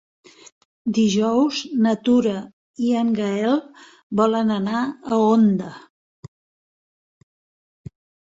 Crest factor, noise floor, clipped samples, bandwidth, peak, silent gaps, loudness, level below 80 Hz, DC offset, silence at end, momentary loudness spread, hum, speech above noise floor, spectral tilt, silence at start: 18 dB; under -90 dBFS; under 0.1%; 7.8 kHz; -4 dBFS; 2.53-2.74 s, 4.03-4.10 s; -20 LUFS; -62 dBFS; under 0.1%; 2.6 s; 9 LU; none; over 71 dB; -6 dB/octave; 0.85 s